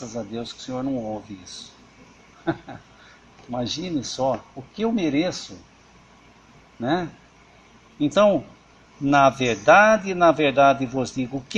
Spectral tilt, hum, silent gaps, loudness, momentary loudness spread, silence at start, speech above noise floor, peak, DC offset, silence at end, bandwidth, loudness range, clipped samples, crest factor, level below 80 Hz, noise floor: -5 dB/octave; none; none; -21 LUFS; 18 LU; 0 s; 30 dB; -2 dBFS; under 0.1%; 0 s; 9.2 kHz; 14 LU; under 0.1%; 22 dB; -56 dBFS; -52 dBFS